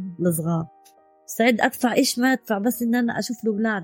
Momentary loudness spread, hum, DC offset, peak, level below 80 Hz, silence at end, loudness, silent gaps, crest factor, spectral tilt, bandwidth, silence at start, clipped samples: 7 LU; none; under 0.1%; -4 dBFS; -64 dBFS; 0 s; -22 LUFS; none; 18 dB; -4.5 dB/octave; 17 kHz; 0 s; under 0.1%